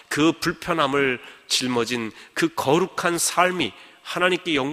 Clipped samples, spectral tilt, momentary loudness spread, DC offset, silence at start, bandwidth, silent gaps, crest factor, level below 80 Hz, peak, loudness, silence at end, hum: under 0.1%; -3.5 dB/octave; 8 LU; under 0.1%; 0.1 s; 15.5 kHz; none; 20 dB; -58 dBFS; -4 dBFS; -22 LUFS; 0 s; none